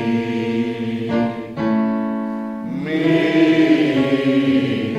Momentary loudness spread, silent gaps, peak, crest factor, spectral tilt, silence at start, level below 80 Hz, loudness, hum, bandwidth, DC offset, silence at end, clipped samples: 10 LU; none; -4 dBFS; 14 dB; -7 dB/octave; 0 s; -56 dBFS; -18 LUFS; none; 9 kHz; under 0.1%; 0 s; under 0.1%